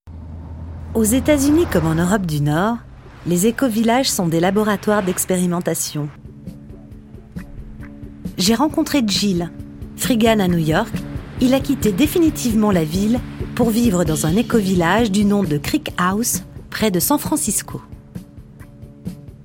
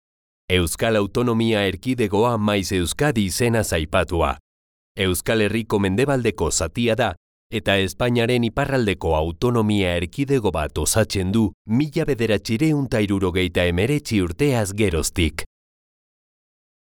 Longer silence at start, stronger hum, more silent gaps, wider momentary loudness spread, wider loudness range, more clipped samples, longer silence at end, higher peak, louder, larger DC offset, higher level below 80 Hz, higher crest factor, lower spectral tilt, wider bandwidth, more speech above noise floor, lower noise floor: second, 0.05 s vs 0.5 s; neither; second, none vs 4.40-4.95 s, 7.17-7.50 s, 11.54-11.65 s; first, 19 LU vs 4 LU; first, 5 LU vs 1 LU; neither; second, 0 s vs 1.55 s; first, 0 dBFS vs -4 dBFS; first, -18 LUFS vs -21 LUFS; neither; about the same, -38 dBFS vs -38 dBFS; about the same, 18 dB vs 18 dB; about the same, -5 dB/octave vs -5 dB/octave; second, 17 kHz vs over 20 kHz; second, 22 dB vs over 70 dB; second, -39 dBFS vs under -90 dBFS